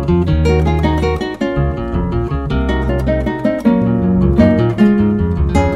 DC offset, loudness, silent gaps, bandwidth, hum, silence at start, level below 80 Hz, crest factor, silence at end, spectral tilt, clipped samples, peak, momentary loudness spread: under 0.1%; -15 LUFS; none; 9.8 kHz; none; 0 s; -22 dBFS; 14 dB; 0 s; -8.5 dB/octave; under 0.1%; 0 dBFS; 7 LU